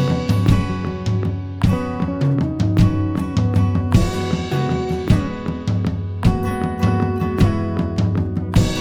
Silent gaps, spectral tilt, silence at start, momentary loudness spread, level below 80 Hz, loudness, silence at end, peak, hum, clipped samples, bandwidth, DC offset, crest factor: none; -7.5 dB/octave; 0 s; 5 LU; -30 dBFS; -19 LUFS; 0 s; -2 dBFS; none; under 0.1%; 14.5 kHz; under 0.1%; 16 dB